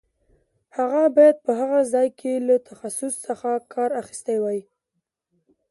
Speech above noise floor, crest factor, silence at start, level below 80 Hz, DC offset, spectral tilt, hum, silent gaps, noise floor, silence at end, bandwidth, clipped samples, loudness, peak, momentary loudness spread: 58 dB; 18 dB; 0.75 s; -72 dBFS; under 0.1%; -4.5 dB/octave; none; none; -79 dBFS; 1.1 s; 11.5 kHz; under 0.1%; -22 LUFS; -4 dBFS; 13 LU